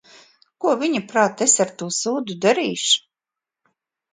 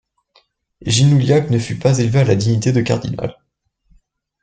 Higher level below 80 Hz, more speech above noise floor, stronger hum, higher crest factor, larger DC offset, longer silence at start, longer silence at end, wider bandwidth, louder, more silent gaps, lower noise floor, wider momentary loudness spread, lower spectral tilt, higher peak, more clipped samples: second, -72 dBFS vs -46 dBFS; first, 68 dB vs 53 dB; neither; about the same, 20 dB vs 16 dB; neither; second, 0.6 s vs 0.8 s; about the same, 1.15 s vs 1.1 s; about the same, 9.6 kHz vs 9.2 kHz; second, -20 LUFS vs -16 LUFS; neither; first, -88 dBFS vs -68 dBFS; second, 7 LU vs 12 LU; second, -2 dB/octave vs -6 dB/octave; about the same, -2 dBFS vs -2 dBFS; neither